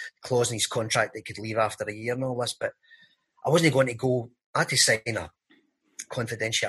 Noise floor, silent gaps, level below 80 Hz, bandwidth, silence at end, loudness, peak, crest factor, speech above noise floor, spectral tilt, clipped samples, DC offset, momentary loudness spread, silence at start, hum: -64 dBFS; 4.46-4.54 s; -64 dBFS; 12.5 kHz; 0 s; -26 LUFS; -8 dBFS; 20 dB; 38 dB; -3.5 dB/octave; under 0.1%; under 0.1%; 14 LU; 0 s; none